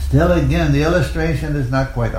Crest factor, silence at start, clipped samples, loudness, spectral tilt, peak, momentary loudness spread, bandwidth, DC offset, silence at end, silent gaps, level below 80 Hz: 14 dB; 0 s; under 0.1%; -17 LUFS; -7 dB/octave; -2 dBFS; 5 LU; 15.5 kHz; under 0.1%; 0 s; none; -24 dBFS